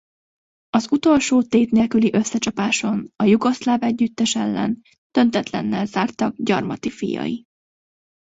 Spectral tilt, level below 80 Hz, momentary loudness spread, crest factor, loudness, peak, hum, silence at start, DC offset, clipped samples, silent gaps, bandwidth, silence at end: -5 dB/octave; -56 dBFS; 9 LU; 18 dB; -20 LUFS; -2 dBFS; none; 0.75 s; under 0.1%; under 0.1%; 4.98-5.10 s; 8 kHz; 0.9 s